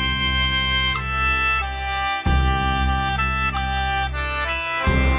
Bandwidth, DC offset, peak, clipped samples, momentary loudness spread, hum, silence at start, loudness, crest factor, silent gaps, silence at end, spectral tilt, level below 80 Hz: 4 kHz; under 0.1%; -6 dBFS; under 0.1%; 5 LU; none; 0 s; -21 LUFS; 14 dB; none; 0 s; -8.5 dB/octave; -26 dBFS